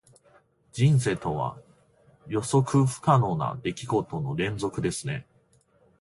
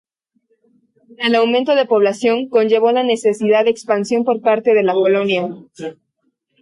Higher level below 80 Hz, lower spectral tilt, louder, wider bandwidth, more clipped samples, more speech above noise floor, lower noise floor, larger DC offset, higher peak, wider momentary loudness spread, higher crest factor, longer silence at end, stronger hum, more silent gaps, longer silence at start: first, -56 dBFS vs -68 dBFS; first, -6.5 dB/octave vs -5 dB/octave; second, -26 LUFS vs -15 LUFS; about the same, 11.5 kHz vs 11.5 kHz; neither; second, 38 dB vs 53 dB; second, -63 dBFS vs -68 dBFS; neither; second, -8 dBFS vs -2 dBFS; first, 11 LU vs 8 LU; about the same, 18 dB vs 14 dB; about the same, 0.8 s vs 0.7 s; neither; neither; second, 0.75 s vs 1.2 s